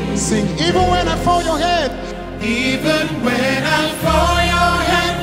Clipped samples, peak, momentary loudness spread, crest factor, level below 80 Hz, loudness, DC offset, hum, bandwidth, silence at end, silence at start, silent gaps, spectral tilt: under 0.1%; -2 dBFS; 5 LU; 14 dB; -28 dBFS; -16 LUFS; under 0.1%; none; 16 kHz; 0 s; 0 s; none; -4.5 dB/octave